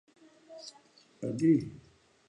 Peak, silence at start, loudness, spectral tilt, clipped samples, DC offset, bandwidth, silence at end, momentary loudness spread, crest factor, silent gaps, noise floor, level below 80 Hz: -14 dBFS; 0.5 s; -30 LUFS; -7.5 dB/octave; under 0.1%; under 0.1%; 10 kHz; 0.5 s; 22 LU; 20 dB; none; -62 dBFS; -68 dBFS